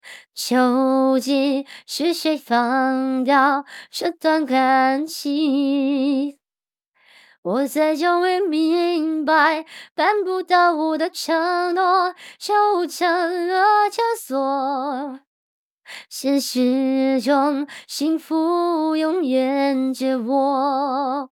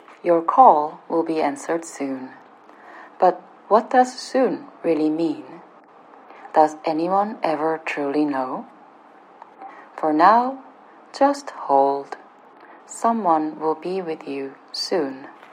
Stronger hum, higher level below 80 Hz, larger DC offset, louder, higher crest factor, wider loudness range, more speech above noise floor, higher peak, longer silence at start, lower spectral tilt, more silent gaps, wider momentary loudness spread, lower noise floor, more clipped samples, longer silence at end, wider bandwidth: neither; about the same, -88 dBFS vs under -90 dBFS; neither; about the same, -20 LUFS vs -21 LUFS; second, 16 dB vs 22 dB; about the same, 3 LU vs 4 LU; first, over 71 dB vs 28 dB; second, -4 dBFS vs 0 dBFS; about the same, 0.05 s vs 0.1 s; second, -3 dB/octave vs -5 dB/octave; first, 6.88-6.92 s, 7.38-7.43 s, 9.91-9.96 s, 15.27-15.78 s vs none; second, 9 LU vs 19 LU; first, under -90 dBFS vs -48 dBFS; neither; second, 0.05 s vs 0.2 s; first, 17 kHz vs 11 kHz